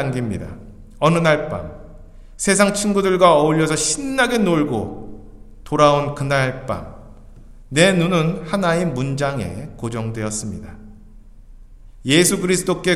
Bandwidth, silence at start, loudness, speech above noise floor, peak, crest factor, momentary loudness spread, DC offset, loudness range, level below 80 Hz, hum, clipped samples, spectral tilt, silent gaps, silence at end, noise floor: 15 kHz; 0 s; -18 LUFS; 24 dB; 0 dBFS; 20 dB; 16 LU; under 0.1%; 6 LU; -40 dBFS; none; under 0.1%; -4.5 dB/octave; none; 0 s; -41 dBFS